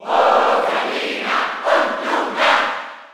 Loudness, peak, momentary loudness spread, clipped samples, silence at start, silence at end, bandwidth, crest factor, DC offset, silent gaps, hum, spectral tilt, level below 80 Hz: -17 LUFS; -2 dBFS; 7 LU; under 0.1%; 0 s; 0.05 s; 16 kHz; 16 dB; under 0.1%; none; none; -2 dB/octave; -70 dBFS